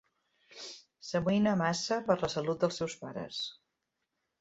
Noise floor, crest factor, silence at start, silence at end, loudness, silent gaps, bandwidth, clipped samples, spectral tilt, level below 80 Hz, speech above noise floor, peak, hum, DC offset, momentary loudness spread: -84 dBFS; 22 dB; 0.5 s; 0.85 s; -32 LUFS; none; 8 kHz; under 0.1%; -5 dB/octave; -66 dBFS; 53 dB; -12 dBFS; none; under 0.1%; 17 LU